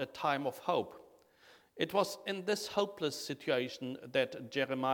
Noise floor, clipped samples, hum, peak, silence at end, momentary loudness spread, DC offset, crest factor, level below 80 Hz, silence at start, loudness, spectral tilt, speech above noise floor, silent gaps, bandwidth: -64 dBFS; under 0.1%; none; -16 dBFS; 0 s; 6 LU; under 0.1%; 20 dB; -78 dBFS; 0 s; -36 LUFS; -4 dB/octave; 28 dB; none; 19 kHz